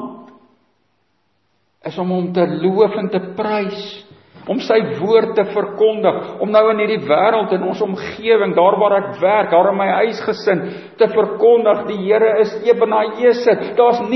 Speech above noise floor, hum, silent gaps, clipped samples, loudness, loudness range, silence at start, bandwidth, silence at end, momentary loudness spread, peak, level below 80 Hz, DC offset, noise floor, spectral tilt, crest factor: 50 dB; none; none; under 0.1%; -16 LUFS; 5 LU; 0 s; 6.2 kHz; 0 s; 9 LU; 0 dBFS; -64 dBFS; under 0.1%; -65 dBFS; -7 dB/octave; 16 dB